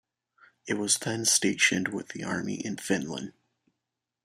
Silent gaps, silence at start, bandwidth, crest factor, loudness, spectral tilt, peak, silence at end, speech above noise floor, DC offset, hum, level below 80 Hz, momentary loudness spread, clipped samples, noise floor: none; 0.65 s; 15.5 kHz; 24 dB; -27 LUFS; -2.5 dB/octave; -8 dBFS; 0.95 s; 57 dB; under 0.1%; none; -70 dBFS; 14 LU; under 0.1%; -86 dBFS